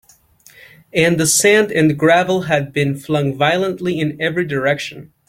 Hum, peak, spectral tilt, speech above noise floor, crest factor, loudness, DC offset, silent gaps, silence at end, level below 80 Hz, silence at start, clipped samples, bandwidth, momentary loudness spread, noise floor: none; -2 dBFS; -4 dB/octave; 33 dB; 16 dB; -16 LUFS; under 0.1%; none; 0.25 s; -52 dBFS; 0.95 s; under 0.1%; 16.5 kHz; 8 LU; -49 dBFS